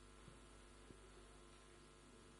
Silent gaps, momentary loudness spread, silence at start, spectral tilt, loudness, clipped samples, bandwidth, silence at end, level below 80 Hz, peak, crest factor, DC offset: none; 2 LU; 0 s; -4 dB/octave; -64 LUFS; under 0.1%; 11.5 kHz; 0 s; -68 dBFS; -46 dBFS; 16 dB; under 0.1%